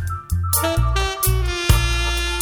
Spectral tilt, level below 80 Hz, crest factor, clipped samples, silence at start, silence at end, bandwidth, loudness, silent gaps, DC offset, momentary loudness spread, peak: -3.5 dB/octave; -22 dBFS; 18 dB; under 0.1%; 0 s; 0 s; over 20 kHz; -20 LUFS; none; under 0.1%; 3 LU; -2 dBFS